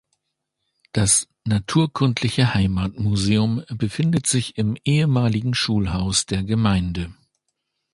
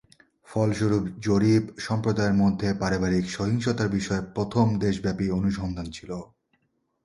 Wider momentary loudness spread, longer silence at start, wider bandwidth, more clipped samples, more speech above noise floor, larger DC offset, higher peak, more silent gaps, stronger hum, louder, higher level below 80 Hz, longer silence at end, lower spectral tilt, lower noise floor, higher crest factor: second, 6 LU vs 10 LU; first, 0.95 s vs 0.5 s; about the same, 11.5 kHz vs 11.5 kHz; neither; first, 58 dB vs 48 dB; neither; first, -4 dBFS vs -8 dBFS; neither; neither; first, -21 LUFS vs -25 LUFS; first, -40 dBFS vs -46 dBFS; about the same, 0.8 s vs 0.8 s; second, -4.5 dB/octave vs -6.5 dB/octave; first, -78 dBFS vs -72 dBFS; about the same, 18 dB vs 18 dB